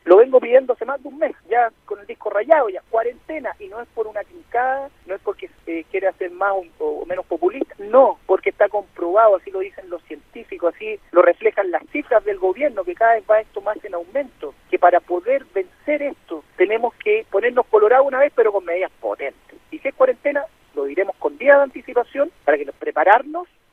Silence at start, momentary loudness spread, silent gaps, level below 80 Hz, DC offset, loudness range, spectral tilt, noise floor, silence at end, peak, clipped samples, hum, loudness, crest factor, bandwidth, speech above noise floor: 0.05 s; 16 LU; none; -58 dBFS; under 0.1%; 6 LU; -6 dB/octave; -38 dBFS; 0.3 s; 0 dBFS; under 0.1%; none; -19 LUFS; 18 dB; 4.1 kHz; 17 dB